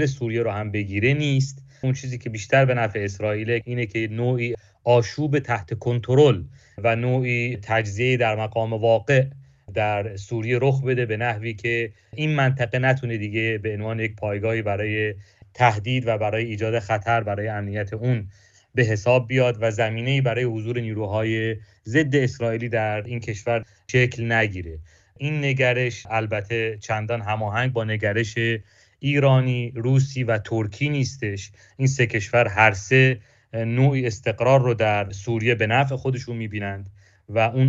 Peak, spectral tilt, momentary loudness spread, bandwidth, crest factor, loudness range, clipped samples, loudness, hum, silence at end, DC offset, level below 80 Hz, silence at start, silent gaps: -2 dBFS; -6.5 dB/octave; 10 LU; 7.6 kHz; 20 dB; 3 LU; under 0.1%; -23 LUFS; none; 0 s; under 0.1%; -54 dBFS; 0 s; none